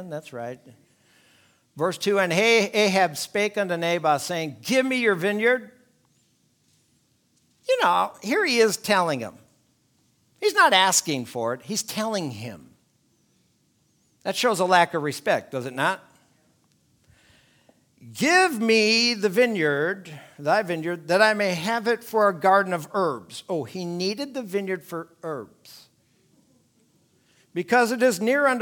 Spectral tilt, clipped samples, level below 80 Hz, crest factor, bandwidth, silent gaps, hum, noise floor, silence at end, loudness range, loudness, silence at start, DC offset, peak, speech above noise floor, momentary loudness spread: -3.5 dB/octave; under 0.1%; -74 dBFS; 22 dB; 19.5 kHz; none; none; -66 dBFS; 0 s; 9 LU; -22 LUFS; 0 s; under 0.1%; -2 dBFS; 43 dB; 16 LU